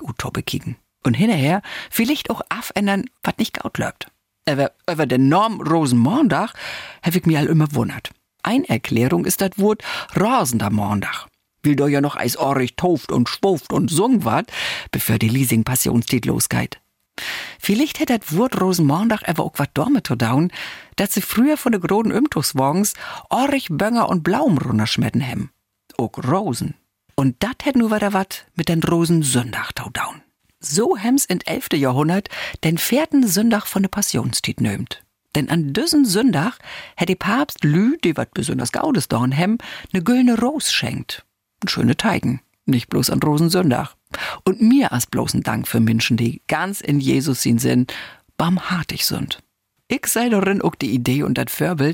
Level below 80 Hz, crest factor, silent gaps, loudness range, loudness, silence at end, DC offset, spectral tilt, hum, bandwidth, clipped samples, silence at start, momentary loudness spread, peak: -50 dBFS; 14 dB; none; 2 LU; -19 LUFS; 0 s; under 0.1%; -5 dB/octave; none; 17 kHz; under 0.1%; 0 s; 10 LU; -6 dBFS